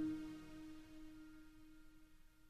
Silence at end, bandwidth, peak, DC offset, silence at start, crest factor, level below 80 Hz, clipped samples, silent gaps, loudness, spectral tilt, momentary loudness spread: 0 s; 13.5 kHz; -34 dBFS; under 0.1%; 0 s; 16 dB; -66 dBFS; under 0.1%; none; -54 LUFS; -6 dB/octave; 17 LU